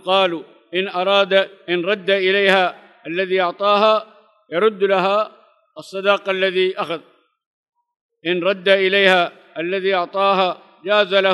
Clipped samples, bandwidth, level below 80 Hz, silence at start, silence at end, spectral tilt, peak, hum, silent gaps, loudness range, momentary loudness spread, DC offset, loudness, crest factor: under 0.1%; 11.5 kHz; -80 dBFS; 0.05 s; 0 s; -5 dB/octave; -2 dBFS; none; 7.46-7.64 s, 7.96-8.09 s; 4 LU; 12 LU; under 0.1%; -18 LUFS; 18 dB